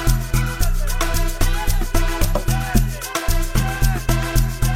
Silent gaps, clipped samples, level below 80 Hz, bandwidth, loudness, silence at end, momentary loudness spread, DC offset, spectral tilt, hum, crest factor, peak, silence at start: none; under 0.1%; -20 dBFS; 16.5 kHz; -21 LUFS; 0 s; 3 LU; 0.6%; -4.5 dB/octave; none; 16 dB; -2 dBFS; 0 s